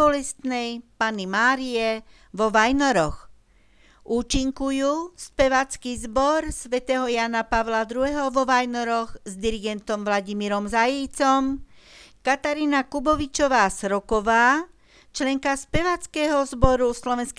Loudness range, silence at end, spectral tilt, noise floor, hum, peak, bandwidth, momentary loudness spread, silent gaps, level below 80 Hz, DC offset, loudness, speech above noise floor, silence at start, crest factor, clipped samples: 2 LU; 0.05 s; -4 dB/octave; -57 dBFS; none; 0 dBFS; 11 kHz; 9 LU; none; -40 dBFS; under 0.1%; -23 LUFS; 34 dB; 0 s; 22 dB; under 0.1%